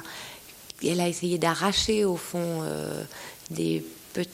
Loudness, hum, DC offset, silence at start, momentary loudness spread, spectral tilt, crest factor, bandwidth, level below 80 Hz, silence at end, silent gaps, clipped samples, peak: -28 LUFS; none; under 0.1%; 0 s; 16 LU; -4 dB/octave; 20 dB; 16.5 kHz; -54 dBFS; 0 s; none; under 0.1%; -8 dBFS